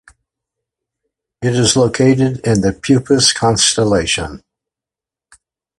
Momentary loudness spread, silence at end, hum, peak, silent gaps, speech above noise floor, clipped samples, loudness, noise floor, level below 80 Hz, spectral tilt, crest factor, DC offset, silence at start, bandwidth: 7 LU; 1.4 s; none; 0 dBFS; none; 75 dB; under 0.1%; -13 LUFS; -88 dBFS; -40 dBFS; -4 dB/octave; 16 dB; under 0.1%; 1.4 s; 11.5 kHz